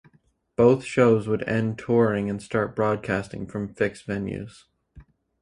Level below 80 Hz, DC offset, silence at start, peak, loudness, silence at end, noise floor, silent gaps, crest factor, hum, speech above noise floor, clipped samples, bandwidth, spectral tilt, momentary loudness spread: -54 dBFS; under 0.1%; 0.6 s; -4 dBFS; -24 LUFS; 0.4 s; -63 dBFS; none; 20 dB; none; 39 dB; under 0.1%; 11 kHz; -7.5 dB/octave; 13 LU